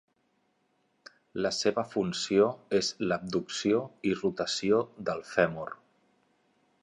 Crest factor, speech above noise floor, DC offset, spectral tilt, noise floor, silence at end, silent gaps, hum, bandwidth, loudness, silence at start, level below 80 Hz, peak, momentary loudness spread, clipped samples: 24 dB; 44 dB; under 0.1%; -4.5 dB/octave; -73 dBFS; 1.05 s; none; none; 10.5 kHz; -29 LUFS; 1.35 s; -66 dBFS; -8 dBFS; 8 LU; under 0.1%